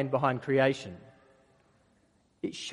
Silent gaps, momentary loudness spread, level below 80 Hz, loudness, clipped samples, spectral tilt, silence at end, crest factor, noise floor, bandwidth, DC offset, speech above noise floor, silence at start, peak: none; 18 LU; -70 dBFS; -30 LUFS; under 0.1%; -6 dB/octave; 0 s; 22 dB; -68 dBFS; 11.5 kHz; under 0.1%; 39 dB; 0 s; -12 dBFS